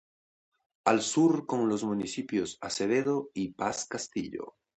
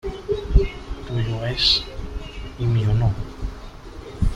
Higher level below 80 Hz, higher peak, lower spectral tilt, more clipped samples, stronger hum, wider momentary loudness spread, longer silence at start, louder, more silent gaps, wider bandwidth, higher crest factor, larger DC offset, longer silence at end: second, -68 dBFS vs -28 dBFS; second, -8 dBFS vs -2 dBFS; second, -4.5 dB/octave vs -6 dB/octave; neither; neither; second, 10 LU vs 19 LU; first, 0.85 s vs 0.05 s; second, -30 LUFS vs -22 LUFS; neither; second, 9 kHz vs 10.5 kHz; about the same, 22 dB vs 20 dB; neither; first, 0.3 s vs 0 s